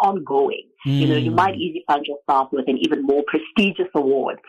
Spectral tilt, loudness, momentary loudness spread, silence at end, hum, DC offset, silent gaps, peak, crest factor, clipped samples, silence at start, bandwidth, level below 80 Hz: -7.5 dB/octave; -20 LUFS; 4 LU; 0.15 s; none; under 0.1%; none; -6 dBFS; 14 dB; under 0.1%; 0 s; 10 kHz; -58 dBFS